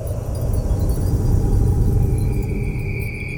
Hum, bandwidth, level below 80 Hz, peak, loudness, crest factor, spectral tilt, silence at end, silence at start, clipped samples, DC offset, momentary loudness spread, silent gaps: none; 19 kHz; -22 dBFS; -6 dBFS; -21 LUFS; 12 dB; -8 dB/octave; 0 s; 0 s; under 0.1%; under 0.1%; 6 LU; none